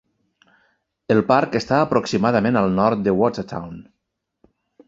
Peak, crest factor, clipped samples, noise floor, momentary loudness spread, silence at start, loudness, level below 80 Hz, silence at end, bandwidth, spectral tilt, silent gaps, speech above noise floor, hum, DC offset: -2 dBFS; 20 dB; under 0.1%; -77 dBFS; 14 LU; 1.1 s; -19 LUFS; -52 dBFS; 1.05 s; 7.8 kHz; -7 dB/octave; none; 59 dB; none; under 0.1%